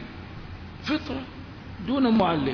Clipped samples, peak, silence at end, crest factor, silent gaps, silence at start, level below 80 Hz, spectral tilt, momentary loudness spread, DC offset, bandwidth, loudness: under 0.1%; -10 dBFS; 0 s; 18 dB; none; 0 s; -48 dBFS; -7.5 dB/octave; 20 LU; under 0.1%; 5.4 kHz; -26 LUFS